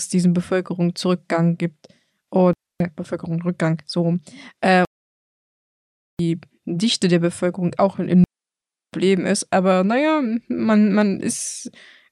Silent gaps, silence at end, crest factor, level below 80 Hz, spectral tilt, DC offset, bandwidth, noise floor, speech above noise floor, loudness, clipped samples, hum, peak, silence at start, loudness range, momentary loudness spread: 4.87-6.17 s; 0.45 s; 16 dB; -58 dBFS; -5.5 dB/octave; under 0.1%; 12 kHz; -89 dBFS; 69 dB; -20 LUFS; under 0.1%; none; -4 dBFS; 0 s; 4 LU; 10 LU